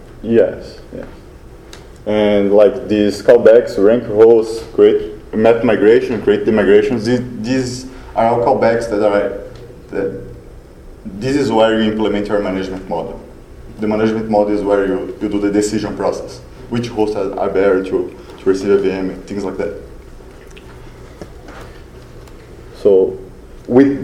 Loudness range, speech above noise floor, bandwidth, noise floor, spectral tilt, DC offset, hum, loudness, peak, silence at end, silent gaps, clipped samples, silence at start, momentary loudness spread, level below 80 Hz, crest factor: 9 LU; 23 dB; 12.5 kHz; -36 dBFS; -6.5 dB/octave; under 0.1%; none; -14 LUFS; 0 dBFS; 0 s; none; under 0.1%; 0 s; 21 LU; -38 dBFS; 16 dB